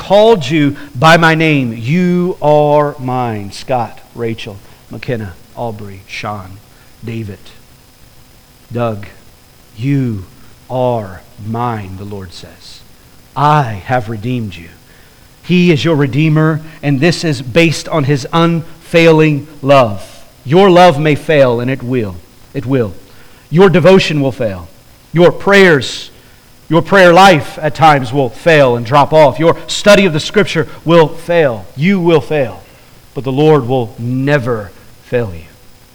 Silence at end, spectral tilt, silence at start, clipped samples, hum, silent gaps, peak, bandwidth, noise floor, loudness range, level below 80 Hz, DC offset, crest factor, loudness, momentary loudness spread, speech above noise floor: 0.5 s; -6 dB/octave; 0 s; under 0.1%; none; none; 0 dBFS; over 20 kHz; -42 dBFS; 13 LU; -42 dBFS; under 0.1%; 12 dB; -11 LUFS; 18 LU; 31 dB